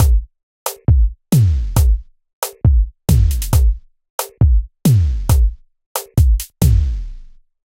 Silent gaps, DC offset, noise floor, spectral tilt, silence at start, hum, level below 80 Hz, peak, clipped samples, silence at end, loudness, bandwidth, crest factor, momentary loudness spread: 0.43-0.66 s, 2.33-2.42 s, 4.10-4.18 s, 5.86-5.95 s; under 0.1%; -37 dBFS; -6.5 dB/octave; 0 s; none; -16 dBFS; -2 dBFS; under 0.1%; 0.5 s; -17 LUFS; 16.5 kHz; 14 dB; 12 LU